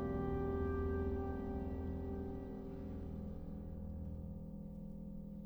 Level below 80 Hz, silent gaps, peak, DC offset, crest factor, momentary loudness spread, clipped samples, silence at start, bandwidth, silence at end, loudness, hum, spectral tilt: -48 dBFS; none; -28 dBFS; under 0.1%; 14 dB; 10 LU; under 0.1%; 0 s; over 20 kHz; 0 s; -44 LUFS; none; -10.5 dB/octave